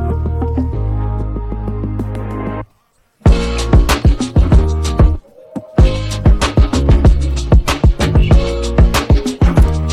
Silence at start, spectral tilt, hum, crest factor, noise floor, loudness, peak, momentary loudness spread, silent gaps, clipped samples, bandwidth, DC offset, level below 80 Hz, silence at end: 0 s; -6.5 dB/octave; none; 12 dB; -57 dBFS; -14 LUFS; 0 dBFS; 11 LU; none; under 0.1%; 13.5 kHz; under 0.1%; -14 dBFS; 0 s